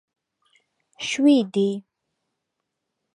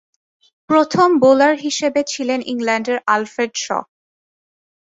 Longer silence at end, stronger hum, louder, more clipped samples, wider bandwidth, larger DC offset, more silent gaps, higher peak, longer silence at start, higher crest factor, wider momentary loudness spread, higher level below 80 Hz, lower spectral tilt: first, 1.35 s vs 1.15 s; neither; second, -21 LUFS vs -17 LUFS; neither; first, 11 kHz vs 8 kHz; neither; neither; second, -8 dBFS vs -2 dBFS; first, 1 s vs 0.7 s; about the same, 18 dB vs 16 dB; first, 14 LU vs 10 LU; second, -76 dBFS vs -64 dBFS; first, -5 dB/octave vs -3.5 dB/octave